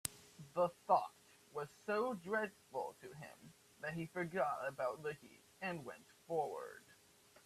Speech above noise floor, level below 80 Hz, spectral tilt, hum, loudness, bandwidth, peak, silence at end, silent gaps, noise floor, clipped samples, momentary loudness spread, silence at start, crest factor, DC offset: 26 dB; -80 dBFS; -4.5 dB/octave; none; -42 LUFS; 15.5 kHz; -16 dBFS; 0.5 s; none; -68 dBFS; under 0.1%; 18 LU; 0.05 s; 26 dB; under 0.1%